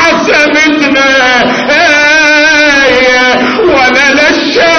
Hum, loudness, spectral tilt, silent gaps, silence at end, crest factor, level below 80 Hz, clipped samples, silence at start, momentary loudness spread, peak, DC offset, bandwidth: none; -5 LUFS; -2.5 dB/octave; none; 0 s; 6 dB; -38 dBFS; 0.4%; 0 s; 3 LU; 0 dBFS; under 0.1%; 11 kHz